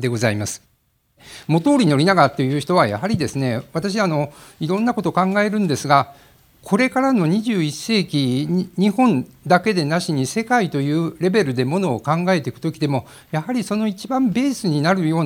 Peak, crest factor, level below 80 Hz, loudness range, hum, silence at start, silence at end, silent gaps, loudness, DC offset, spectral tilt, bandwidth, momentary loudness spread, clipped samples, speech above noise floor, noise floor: 0 dBFS; 18 dB; -58 dBFS; 2 LU; none; 0 s; 0 s; none; -19 LUFS; under 0.1%; -6 dB/octave; 17 kHz; 8 LU; under 0.1%; 42 dB; -60 dBFS